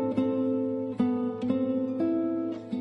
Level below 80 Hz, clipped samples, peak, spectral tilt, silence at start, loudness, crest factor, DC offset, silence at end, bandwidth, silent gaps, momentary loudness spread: -66 dBFS; under 0.1%; -14 dBFS; -9.5 dB/octave; 0 s; -29 LUFS; 14 dB; under 0.1%; 0 s; 5.2 kHz; none; 3 LU